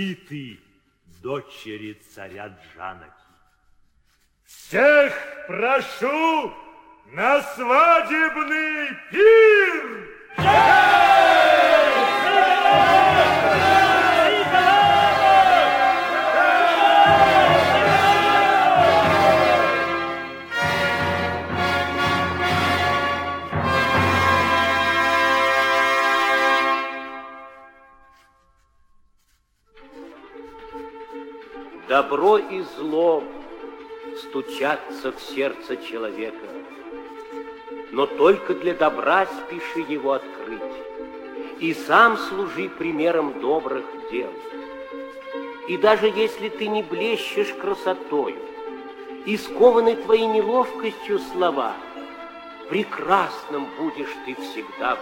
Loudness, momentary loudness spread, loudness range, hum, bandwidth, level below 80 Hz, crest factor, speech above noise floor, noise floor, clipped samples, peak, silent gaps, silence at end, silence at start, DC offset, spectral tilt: -18 LUFS; 22 LU; 12 LU; none; 17 kHz; -54 dBFS; 18 dB; 43 dB; -64 dBFS; under 0.1%; -2 dBFS; none; 0 s; 0 s; under 0.1%; -4.5 dB/octave